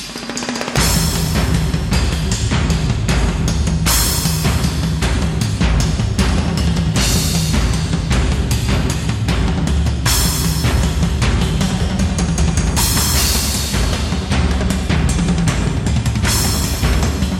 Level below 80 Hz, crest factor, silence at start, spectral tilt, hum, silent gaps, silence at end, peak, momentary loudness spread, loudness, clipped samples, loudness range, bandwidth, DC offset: -20 dBFS; 14 dB; 0 s; -4.5 dB/octave; none; none; 0 s; -2 dBFS; 4 LU; -16 LUFS; under 0.1%; 1 LU; 17 kHz; under 0.1%